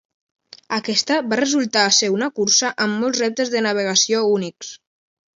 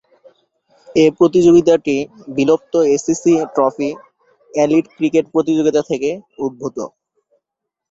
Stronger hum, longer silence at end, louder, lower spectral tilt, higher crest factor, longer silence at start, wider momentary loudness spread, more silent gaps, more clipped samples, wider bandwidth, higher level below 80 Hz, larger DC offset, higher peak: neither; second, 0.65 s vs 1.05 s; about the same, -18 LUFS vs -16 LUFS; second, -2 dB/octave vs -6 dB/octave; about the same, 18 dB vs 16 dB; second, 0.7 s vs 0.9 s; second, 9 LU vs 13 LU; neither; neither; about the same, 7.8 kHz vs 7.8 kHz; second, -70 dBFS vs -56 dBFS; neither; about the same, -2 dBFS vs 0 dBFS